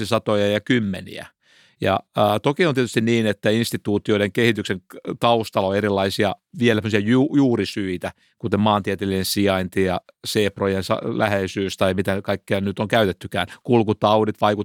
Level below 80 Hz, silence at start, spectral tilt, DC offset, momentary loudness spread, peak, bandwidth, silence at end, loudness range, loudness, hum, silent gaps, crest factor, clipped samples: -58 dBFS; 0 s; -5.5 dB/octave; under 0.1%; 8 LU; -4 dBFS; 18 kHz; 0 s; 2 LU; -21 LUFS; none; none; 18 dB; under 0.1%